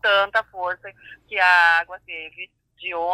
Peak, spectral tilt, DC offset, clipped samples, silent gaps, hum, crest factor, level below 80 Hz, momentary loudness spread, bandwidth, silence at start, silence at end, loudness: -4 dBFS; -1.5 dB/octave; under 0.1%; under 0.1%; none; none; 18 dB; -62 dBFS; 22 LU; 13 kHz; 0.05 s; 0 s; -19 LUFS